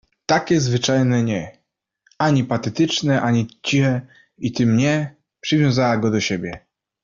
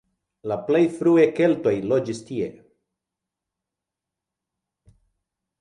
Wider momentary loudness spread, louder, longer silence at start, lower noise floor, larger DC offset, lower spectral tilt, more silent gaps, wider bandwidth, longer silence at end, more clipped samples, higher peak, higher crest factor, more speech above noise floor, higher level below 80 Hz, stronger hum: about the same, 10 LU vs 12 LU; first, -19 LUFS vs -22 LUFS; second, 0.3 s vs 0.45 s; second, -67 dBFS vs -86 dBFS; neither; second, -5.5 dB/octave vs -7 dB/octave; neither; second, 7.6 kHz vs 11 kHz; second, 0.45 s vs 3.1 s; neither; about the same, -4 dBFS vs -6 dBFS; about the same, 16 dB vs 20 dB; second, 48 dB vs 66 dB; first, -54 dBFS vs -64 dBFS; neither